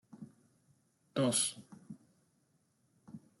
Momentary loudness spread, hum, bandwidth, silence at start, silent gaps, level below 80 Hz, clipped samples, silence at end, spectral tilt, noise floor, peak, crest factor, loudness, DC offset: 25 LU; none; 12.5 kHz; 0.15 s; none; -82 dBFS; under 0.1%; 0.2 s; -3.5 dB/octave; -75 dBFS; -20 dBFS; 22 dB; -33 LUFS; under 0.1%